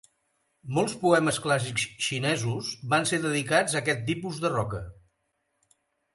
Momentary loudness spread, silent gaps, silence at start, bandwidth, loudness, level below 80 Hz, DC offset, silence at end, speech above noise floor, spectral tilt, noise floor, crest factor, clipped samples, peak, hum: 9 LU; none; 0.65 s; 12 kHz; -26 LUFS; -58 dBFS; under 0.1%; 1.2 s; 50 dB; -4 dB/octave; -77 dBFS; 20 dB; under 0.1%; -8 dBFS; none